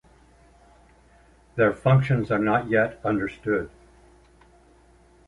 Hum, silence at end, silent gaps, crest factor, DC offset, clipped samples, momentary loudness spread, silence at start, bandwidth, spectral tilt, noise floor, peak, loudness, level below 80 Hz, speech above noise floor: none; 1.6 s; none; 18 dB; under 0.1%; under 0.1%; 8 LU; 1.55 s; 10.5 kHz; -9 dB/octave; -56 dBFS; -8 dBFS; -23 LUFS; -52 dBFS; 33 dB